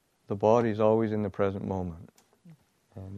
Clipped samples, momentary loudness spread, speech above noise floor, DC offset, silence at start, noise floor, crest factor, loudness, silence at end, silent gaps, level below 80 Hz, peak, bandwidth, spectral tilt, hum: under 0.1%; 15 LU; 30 dB; under 0.1%; 0.3 s; -57 dBFS; 20 dB; -27 LUFS; 0 s; none; -62 dBFS; -10 dBFS; 7.8 kHz; -8.5 dB/octave; none